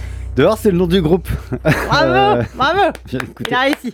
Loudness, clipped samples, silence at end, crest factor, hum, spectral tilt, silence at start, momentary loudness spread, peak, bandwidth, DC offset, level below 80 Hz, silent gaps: -15 LUFS; under 0.1%; 0 s; 14 dB; none; -6 dB/octave; 0 s; 10 LU; -2 dBFS; 17.5 kHz; under 0.1%; -30 dBFS; none